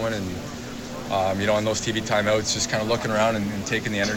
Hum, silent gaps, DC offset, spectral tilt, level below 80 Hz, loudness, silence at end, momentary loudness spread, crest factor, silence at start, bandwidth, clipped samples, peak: none; none; under 0.1%; -4 dB/octave; -48 dBFS; -24 LUFS; 0 s; 12 LU; 16 dB; 0 s; 18.5 kHz; under 0.1%; -8 dBFS